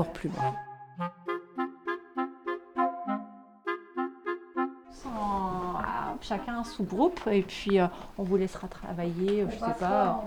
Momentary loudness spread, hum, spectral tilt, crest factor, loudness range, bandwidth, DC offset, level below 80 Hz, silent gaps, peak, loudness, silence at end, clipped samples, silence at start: 11 LU; none; -7 dB/octave; 18 dB; 5 LU; 19 kHz; under 0.1%; -52 dBFS; none; -14 dBFS; -32 LUFS; 0 s; under 0.1%; 0 s